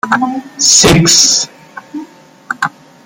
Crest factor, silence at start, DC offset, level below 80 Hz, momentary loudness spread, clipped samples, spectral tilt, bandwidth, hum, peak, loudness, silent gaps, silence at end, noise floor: 12 dB; 0.05 s; under 0.1%; -38 dBFS; 22 LU; 0.2%; -2 dB/octave; over 20 kHz; none; 0 dBFS; -8 LUFS; none; 0.35 s; -35 dBFS